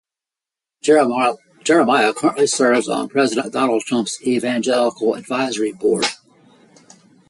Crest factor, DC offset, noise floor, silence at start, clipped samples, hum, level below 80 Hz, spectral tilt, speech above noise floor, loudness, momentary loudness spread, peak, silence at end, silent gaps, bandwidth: 16 dB; under 0.1%; -88 dBFS; 0.85 s; under 0.1%; none; -66 dBFS; -3.5 dB/octave; 71 dB; -18 LUFS; 7 LU; -2 dBFS; 1.15 s; none; 11.5 kHz